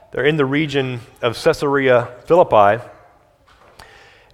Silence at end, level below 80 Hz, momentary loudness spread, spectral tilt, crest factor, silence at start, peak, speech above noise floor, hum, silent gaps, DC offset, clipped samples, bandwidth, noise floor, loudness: 1.45 s; -50 dBFS; 10 LU; -6 dB/octave; 18 dB; 0.15 s; 0 dBFS; 36 dB; none; none; under 0.1%; under 0.1%; 14.5 kHz; -52 dBFS; -17 LUFS